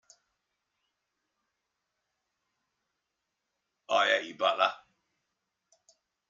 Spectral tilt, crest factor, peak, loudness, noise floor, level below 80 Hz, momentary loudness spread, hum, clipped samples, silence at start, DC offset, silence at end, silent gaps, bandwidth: -1.5 dB/octave; 26 dB; -10 dBFS; -28 LUFS; -84 dBFS; under -90 dBFS; 5 LU; none; under 0.1%; 3.9 s; under 0.1%; 1.5 s; none; 7.6 kHz